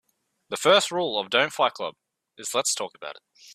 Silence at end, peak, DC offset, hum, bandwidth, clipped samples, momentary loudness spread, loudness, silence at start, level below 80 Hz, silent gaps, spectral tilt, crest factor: 0 s; -4 dBFS; under 0.1%; none; 15 kHz; under 0.1%; 16 LU; -23 LUFS; 0.5 s; -76 dBFS; none; -1.5 dB/octave; 22 dB